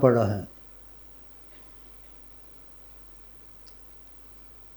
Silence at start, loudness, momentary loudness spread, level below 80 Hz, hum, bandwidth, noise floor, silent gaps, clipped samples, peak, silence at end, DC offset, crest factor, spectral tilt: 0 s; -35 LUFS; 14 LU; -56 dBFS; none; over 20 kHz; -47 dBFS; none; under 0.1%; -4 dBFS; 4.3 s; under 0.1%; 26 dB; -8.5 dB/octave